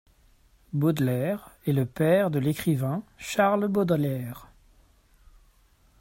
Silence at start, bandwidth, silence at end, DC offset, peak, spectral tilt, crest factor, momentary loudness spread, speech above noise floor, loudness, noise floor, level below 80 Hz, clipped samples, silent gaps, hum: 0.75 s; 16.5 kHz; 1.55 s; under 0.1%; -8 dBFS; -7 dB/octave; 18 dB; 11 LU; 36 dB; -26 LUFS; -61 dBFS; -58 dBFS; under 0.1%; none; none